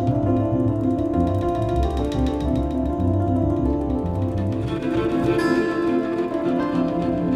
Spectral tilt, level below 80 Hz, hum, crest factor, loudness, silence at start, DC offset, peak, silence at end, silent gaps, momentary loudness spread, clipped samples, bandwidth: -8.5 dB/octave; -32 dBFS; none; 12 dB; -22 LUFS; 0 s; under 0.1%; -8 dBFS; 0 s; none; 3 LU; under 0.1%; 12 kHz